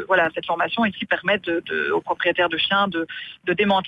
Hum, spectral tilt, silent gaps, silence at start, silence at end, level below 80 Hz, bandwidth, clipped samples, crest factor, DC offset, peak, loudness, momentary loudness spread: none; -6.5 dB/octave; none; 0 s; 0 s; -58 dBFS; 7.6 kHz; under 0.1%; 16 dB; under 0.1%; -6 dBFS; -22 LUFS; 6 LU